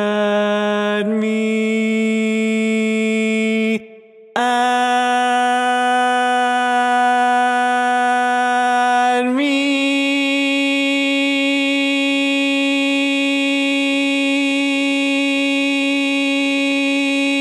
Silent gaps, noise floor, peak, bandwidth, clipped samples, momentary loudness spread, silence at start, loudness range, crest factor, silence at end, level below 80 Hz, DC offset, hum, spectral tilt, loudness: none; -42 dBFS; -2 dBFS; 12 kHz; under 0.1%; 2 LU; 0 s; 2 LU; 16 dB; 0 s; -80 dBFS; under 0.1%; none; -3.5 dB/octave; -16 LUFS